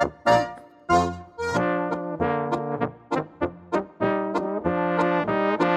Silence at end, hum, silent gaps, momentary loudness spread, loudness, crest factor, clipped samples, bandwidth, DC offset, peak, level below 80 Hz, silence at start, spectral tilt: 0 s; none; none; 8 LU; -25 LUFS; 18 dB; under 0.1%; 13.5 kHz; under 0.1%; -6 dBFS; -52 dBFS; 0 s; -6.5 dB/octave